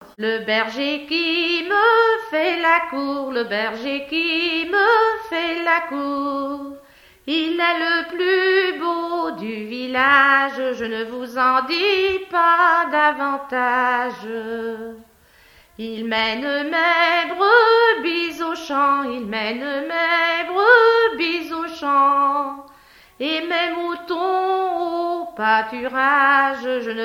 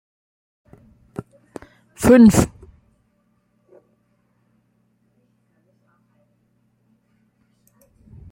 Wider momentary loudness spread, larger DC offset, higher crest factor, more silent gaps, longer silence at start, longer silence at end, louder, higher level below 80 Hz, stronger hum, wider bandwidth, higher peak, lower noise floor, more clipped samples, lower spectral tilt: second, 12 LU vs 31 LU; neither; about the same, 20 dB vs 22 dB; neither; second, 0 s vs 2 s; second, 0 s vs 5.85 s; second, -19 LUFS vs -14 LUFS; second, -60 dBFS vs -46 dBFS; neither; about the same, 16.5 kHz vs 16 kHz; about the same, 0 dBFS vs -2 dBFS; second, -52 dBFS vs -65 dBFS; neither; second, -3.5 dB/octave vs -6.5 dB/octave